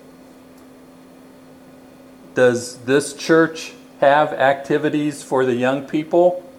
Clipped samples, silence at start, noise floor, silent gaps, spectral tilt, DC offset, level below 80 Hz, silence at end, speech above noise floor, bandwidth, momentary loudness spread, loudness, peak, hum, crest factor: under 0.1%; 2.35 s; -44 dBFS; none; -5 dB/octave; under 0.1%; -66 dBFS; 0.05 s; 27 dB; 15 kHz; 8 LU; -18 LUFS; -2 dBFS; none; 18 dB